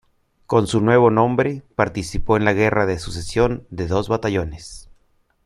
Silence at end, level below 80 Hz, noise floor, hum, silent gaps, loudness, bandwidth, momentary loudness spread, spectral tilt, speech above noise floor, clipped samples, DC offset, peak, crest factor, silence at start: 0.65 s; -38 dBFS; -61 dBFS; none; none; -19 LUFS; 12.5 kHz; 12 LU; -6.5 dB/octave; 42 dB; under 0.1%; under 0.1%; -2 dBFS; 18 dB; 0.5 s